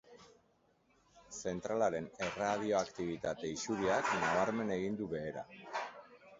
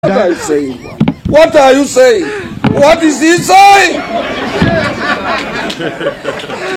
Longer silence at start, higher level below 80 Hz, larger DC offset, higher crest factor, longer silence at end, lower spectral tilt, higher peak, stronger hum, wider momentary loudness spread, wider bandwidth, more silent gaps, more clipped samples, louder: about the same, 0.05 s vs 0.05 s; second, -68 dBFS vs -36 dBFS; neither; first, 18 dB vs 10 dB; about the same, 0.05 s vs 0 s; about the same, -4 dB/octave vs -4.5 dB/octave; second, -18 dBFS vs 0 dBFS; neither; about the same, 11 LU vs 13 LU; second, 7.6 kHz vs 17 kHz; neither; second, under 0.1% vs 2%; second, -37 LUFS vs -9 LUFS